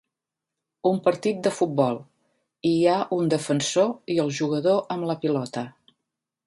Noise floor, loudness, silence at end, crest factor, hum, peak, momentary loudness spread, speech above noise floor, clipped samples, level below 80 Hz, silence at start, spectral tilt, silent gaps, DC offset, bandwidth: -86 dBFS; -24 LUFS; 0.75 s; 18 dB; none; -6 dBFS; 7 LU; 63 dB; under 0.1%; -70 dBFS; 0.85 s; -5.5 dB/octave; none; under 0.1%; 11.5 kHz